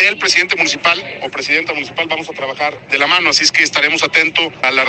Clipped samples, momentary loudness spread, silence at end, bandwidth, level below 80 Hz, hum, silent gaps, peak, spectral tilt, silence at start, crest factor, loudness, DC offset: under 0.1%; 9 LU; 0 s; 11 kHz; -58 dBFS; none; none; 0 dBFS; -1 dB/octave; 0 s; 14 dB; -13 LUFS; under 0.1%